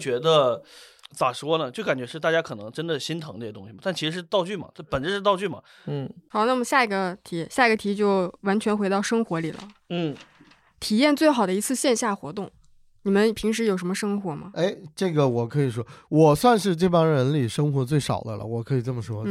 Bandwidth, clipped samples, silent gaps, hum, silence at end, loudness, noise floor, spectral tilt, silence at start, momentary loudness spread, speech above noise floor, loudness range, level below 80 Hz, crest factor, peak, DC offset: 15.5 kHz; under 0.1%; none; none; 0 s; -24 LUFS; -56 dBFS; -5.5 dB/octave; 0 s; 13 LU; 32 dB; 6 LU; -58 dBFS; 18 dB; -6 dBFS; under 0.1%